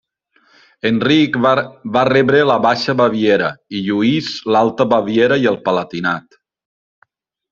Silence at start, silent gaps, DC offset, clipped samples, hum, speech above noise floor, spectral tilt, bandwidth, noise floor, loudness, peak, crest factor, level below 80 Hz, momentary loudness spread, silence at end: 0.85 s; none; under 0.1%; under 0.1%; none; 43 dB; -6.5 dB/octave; 7.6 kHz; -58 dBFS; -15 LUFS; 0 dBFS; 16 dB; -56 dBFS; 8 LU; 1.3 s